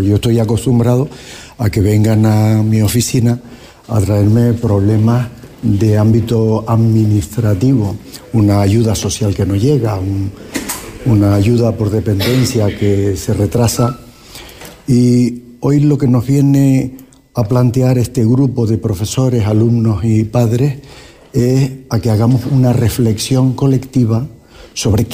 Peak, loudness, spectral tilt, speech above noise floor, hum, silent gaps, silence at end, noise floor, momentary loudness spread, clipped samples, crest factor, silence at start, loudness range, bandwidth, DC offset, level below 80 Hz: -2 dBFS; -13 LUFS; -7 dB/octave; 23 dB; none; none; 0 s; -34 dBFS; 10 LU; under 0.1%; 10 dB; 0 s; 2 LU; 15.5 kHz; under 0.1%; -36 dBFS